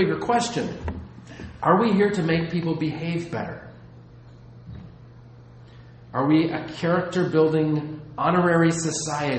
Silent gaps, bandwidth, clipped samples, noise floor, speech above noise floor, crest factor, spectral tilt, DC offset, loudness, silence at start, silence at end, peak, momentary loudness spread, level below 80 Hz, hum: none; 8.8 kHz; under 0.1%; -46 dBFS; 23 dB; 20 dB; -6 dB/octave; under 0.1%; -23 LUFS; 0 s; 0 s; -4 dBFS; 21 LU; -50 dBFS; none